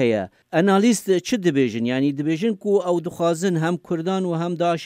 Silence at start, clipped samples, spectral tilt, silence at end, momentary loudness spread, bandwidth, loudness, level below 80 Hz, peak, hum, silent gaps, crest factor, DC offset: 0 s; under 0.1%; -6 dB/octave; 0 s; 6 LU; 16 kHz; -21 LUFS; -66 dBFS; -6 dBFS; none; none; 16 dB; under 0.1%